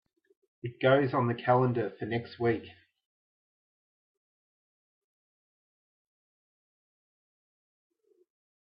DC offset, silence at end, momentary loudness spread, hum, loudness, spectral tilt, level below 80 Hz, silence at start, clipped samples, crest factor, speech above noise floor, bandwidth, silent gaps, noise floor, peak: under 0.1%; 6 s; 11 LU; none; -29 LUFS; -10.5 dB/octave; -76 dBFS; 0.65 s; under 0.1%; 22 dB; over 62 dB; 5.4 kHz; none; under -90 dBFS; -12 dBFS